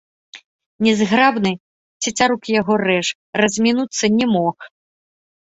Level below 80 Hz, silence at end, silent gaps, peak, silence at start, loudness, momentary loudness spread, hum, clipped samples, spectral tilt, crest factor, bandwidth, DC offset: -58 dBFS; 0.75 s; 0.45-0.59 s, 0.66-0.79 s, 1.60-2.00 s, 3.15-3.33 s; -2 dBFS; 0.35 s; -17 LUFS; 9 LU; none; under 0.1%; -4 dB/octave; 18 dB; 8 kHz; under 0.1%